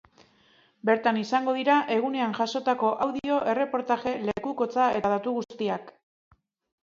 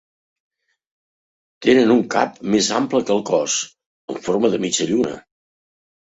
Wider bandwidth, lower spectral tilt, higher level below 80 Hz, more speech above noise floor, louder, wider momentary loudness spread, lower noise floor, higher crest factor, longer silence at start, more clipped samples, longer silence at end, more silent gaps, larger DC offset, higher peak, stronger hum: second, 7.6 kHz vs 8.4 kHz; first, -5.5 dB/octave vs -3.5 dB/octave; second, -66 dBFS vs -60 dBFS; second, 36 dB vs over 72 dB; second, -26 LUFS vs -19 LUFS; second, 7 LU vs 11 LU; second, -62 dBFS vs under -90 dBFS; about the same, 18 dB vs 18 dB; second, 0.85 s vs 1.6 s; neither; about the same, 0.95 s vs 0.95 s; second, none vs 3.86-4.08 s; neither; second, -10 dBFS vs -2 dBFS; neither